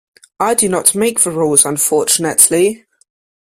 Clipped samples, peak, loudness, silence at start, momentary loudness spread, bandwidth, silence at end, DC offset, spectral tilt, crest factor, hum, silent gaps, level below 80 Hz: 0.2%; 0 dBFS; -12 LUFS; 0.4 s; 7 LU; over 20 kHz; 0.75 s; under 0.1%; -2.5 dB/octave; 14 dB; none; none; -56 dBFS